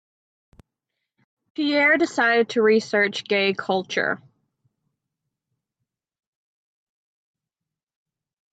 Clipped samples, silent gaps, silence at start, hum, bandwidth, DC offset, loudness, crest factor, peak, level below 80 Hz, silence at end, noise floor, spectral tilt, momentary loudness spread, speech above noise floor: under 0.1%; none; 1.6 s; none; 9 kHz; under 0.1%; -20 LUFS; 18 dB; -8 dBFS; -72 dBFS; 4.35 s; -87 dBFS; -4 dB/octave; 9 LU; 67 dB